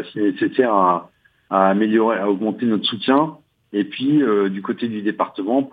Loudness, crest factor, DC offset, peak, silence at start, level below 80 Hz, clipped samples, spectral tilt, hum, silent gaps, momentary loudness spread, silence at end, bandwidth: -19 LUFS; 18 dB; under 0.1%; -2 dBFS; 0 s; -74 dBFS; under 0.1%; -8.5 dB/octave; none; none; 8 LU; 0.05 s; 4.9 kHz